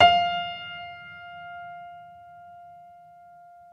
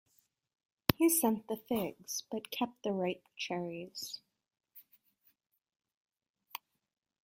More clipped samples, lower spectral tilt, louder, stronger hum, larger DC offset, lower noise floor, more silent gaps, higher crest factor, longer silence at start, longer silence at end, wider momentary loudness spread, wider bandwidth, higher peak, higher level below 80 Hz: neither; about the same, -4 dB/octave vs -4 dB/octave; first, -27 LUFS vs -35 LUFS; neither; neither; second, -50 dBFS vs -75 dBFS; second, none vs 5.94-6.05 s, 6.30-6.34 s; second, 24 dB vs 36 dB; second, 0 s vs 0.9 s; first, 1.75 s vs 0.65 s; first, 24 LU vs 20 LU; second, 6.8 kHz vs 16.5 kHz; about the same, -4 dBFS vs -2 dBFS; about the same, -62 dBFS vs -64 dBFS